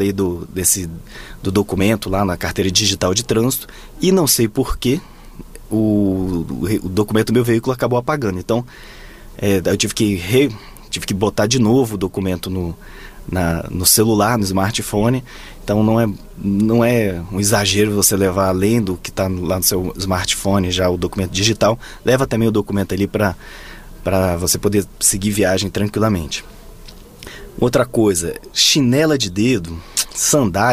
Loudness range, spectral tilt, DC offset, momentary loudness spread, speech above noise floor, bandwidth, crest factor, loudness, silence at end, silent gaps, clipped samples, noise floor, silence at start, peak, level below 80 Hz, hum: 3 LU; -4 dB/octave; under 0.1%; 10 LU; 21 dB; 16 kHz; 18 dB; -17 LUFS; 0 s; none; under 0.1%; -38 dBFS; 0 s; 0 dBFS; -36 dBFS; none